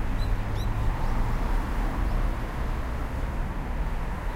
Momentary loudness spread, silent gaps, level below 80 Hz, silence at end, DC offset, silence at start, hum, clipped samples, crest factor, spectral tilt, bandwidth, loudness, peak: 3 LU; none; -28 dBFS; 0 s; under 0.1%; 0 s; none; under 0.1%; 12 dB; -7 dB/octave; 15 kHz; -31 LUFS; -14 dBFS